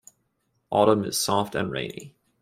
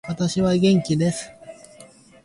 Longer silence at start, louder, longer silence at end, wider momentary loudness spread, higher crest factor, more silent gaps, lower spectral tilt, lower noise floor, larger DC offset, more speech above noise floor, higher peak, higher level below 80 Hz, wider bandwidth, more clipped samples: first, 0.7 s vs 0.05 s; second, -24 LUFS vs -20 LUFS; about the same, 0.35 s vs 0.4 s; about the same, 13 LU vs 13 LU; first, 20 dB vs 14 dB; neither; second, -4 dB/octave vs -6 dB/octave; first, -73 dBFS vs -48 dBFS; neither; first, 49 dB vs 28 dB; about the same, -6 dBFS vs -8 dBFS; second, -60 dBFS vs -52 dBFS; first, 16 kHz vs 11.5 kHz; neither